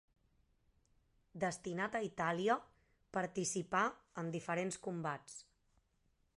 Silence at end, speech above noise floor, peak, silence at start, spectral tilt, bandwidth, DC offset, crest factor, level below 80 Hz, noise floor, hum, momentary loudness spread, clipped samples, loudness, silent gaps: 0.95 s; 38 dB; -20 dBFS; 1.35 s; -4.5 dB/octave; 11.5 kHz; under 0.1%; 22 dB; -76 dBFS; -78 dBFS; none; 10 LU; under 0.1%; -40 LUFS; none